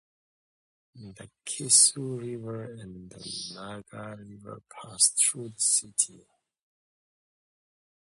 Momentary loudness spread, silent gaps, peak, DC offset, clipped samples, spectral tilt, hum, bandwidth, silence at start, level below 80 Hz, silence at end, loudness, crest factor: 25 LU; none; -6 dBFS; under 0.1%; under 0.1%; -1.5 dB/octave; none; 12 kHz; 0.95 s; -70 dBFS; 1.95 s; -24 LUFS; 24 dB